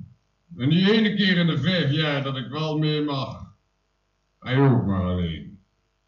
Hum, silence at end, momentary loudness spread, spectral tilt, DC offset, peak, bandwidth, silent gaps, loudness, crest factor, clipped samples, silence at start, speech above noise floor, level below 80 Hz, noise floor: none; 0.5 s; 11 LU; -7.5 dB/octave; under 0.1%; -8 dBFS; 7 kHz; none; -22 LUFS; 16 dB; under 0.1%; 0 s; 49 dB; -52 dBFS; -71 dBFS